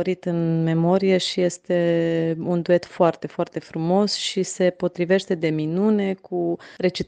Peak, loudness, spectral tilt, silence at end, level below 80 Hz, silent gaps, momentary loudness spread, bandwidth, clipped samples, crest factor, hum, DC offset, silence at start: -4 dBFS; -22 LUFS; -6 dB/octave; 0.05 s; -62 dBFS; none; 7 LU; 9.6 kHz; under 0.1%; 18 dB; none; under 0.1%; 0 s